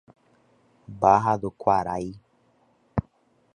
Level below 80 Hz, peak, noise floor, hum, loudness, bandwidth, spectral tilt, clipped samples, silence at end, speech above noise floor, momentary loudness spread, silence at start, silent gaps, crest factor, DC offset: -52 dBFS; -4 dBFS; -64 dBFS; none; -24 LUFS; 10 kHz; -7.5 dB/octave; under 0.1%; 0.55 s; 41 dB; 14 LU; 0.9 s; none; 22 dB; under 0.1%